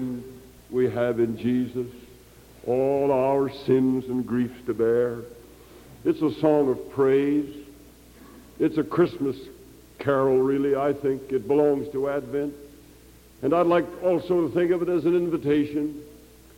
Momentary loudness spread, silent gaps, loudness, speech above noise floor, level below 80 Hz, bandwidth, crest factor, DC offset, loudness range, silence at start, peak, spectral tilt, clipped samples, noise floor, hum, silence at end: 12 LU; none; -24 LUFS; 27 dB; -56 dBFS; 17 kHz; 16 dB; under 0.1%; 2 LU; 0 s; -8 dBFS; -8 dB/octave; under 0.1%; -51 dBFS; 60 Hz at -55 dBFS; 0.45 s